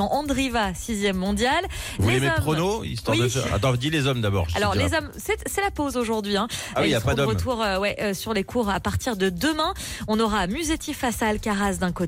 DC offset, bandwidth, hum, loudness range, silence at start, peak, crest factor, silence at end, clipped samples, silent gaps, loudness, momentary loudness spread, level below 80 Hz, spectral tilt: under 0.1%; 16.5 kHz; none; 2 LU; 0 s; -10 dBFS; 12 dB; 0 s; under 0.1%; none; -24 LUFS; 5 LU; -40 dBFS; -4.5 dB/octave